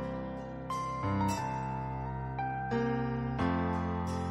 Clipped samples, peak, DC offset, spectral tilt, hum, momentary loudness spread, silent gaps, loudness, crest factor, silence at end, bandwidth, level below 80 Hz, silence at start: under 0.1%; -18 dBFS; under 0.1%; -7 dB/octave; none; 7 LU; none; -34 LUFS; 16 dB; 0 s; 15.5 kHz; -50 dBFS; 0 s